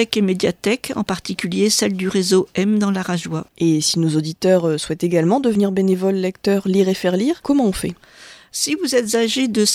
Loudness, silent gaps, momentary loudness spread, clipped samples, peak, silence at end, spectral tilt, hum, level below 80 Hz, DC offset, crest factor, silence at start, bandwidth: -18 LUFS; none; 7 LU; under 0.1%; 0 dBFS; 0 s; -4.5 dB/octave; none; -50 dBFS; under 0.1%; 18 dB; 0 s; 15.5 kHz